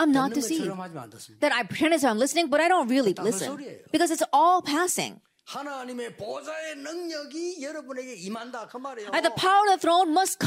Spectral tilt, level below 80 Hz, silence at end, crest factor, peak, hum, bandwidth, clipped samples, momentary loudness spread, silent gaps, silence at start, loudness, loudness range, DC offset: -3 dB/octave; -72 dBFS; 0 s; 14 dB; -12 dBFS; none; 16 kHz; under 0.1%; 16 LU; none; 0 s; -25 LUFS; 11 LU; under 0.1%